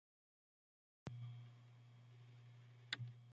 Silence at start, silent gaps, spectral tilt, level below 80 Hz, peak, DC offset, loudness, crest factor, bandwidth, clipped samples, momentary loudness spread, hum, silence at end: 1.05 s; none; -3 dB/octave; -82 dBFS; -28 dBFS; under 0.1%; -55 LUFS; 30 dB; 7.4 kHz; under 0.1%; 15 LU; none; 0 s